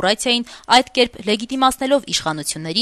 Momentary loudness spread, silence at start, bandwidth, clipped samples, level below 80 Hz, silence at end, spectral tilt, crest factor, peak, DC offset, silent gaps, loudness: 7 LU; 0 s; 13.5 kHz; under 0.1%; -50 dBFS; 0 s; -2.5 dB/octave; 18 dB; 0 dBFS; under 0.1%; none; -18 LUFS